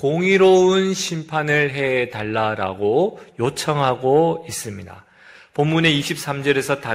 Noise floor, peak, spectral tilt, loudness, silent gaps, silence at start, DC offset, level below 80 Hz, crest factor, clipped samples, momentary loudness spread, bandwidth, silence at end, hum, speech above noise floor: -47 dBFS; -2 dBFS; -5 dB/octave; -19 LUFS; none; 0 s; under 0.1%; -58 dBFS; 16 dB; under 0.1%; 10 LU; 16 kHz; 0 s; none; 28 dB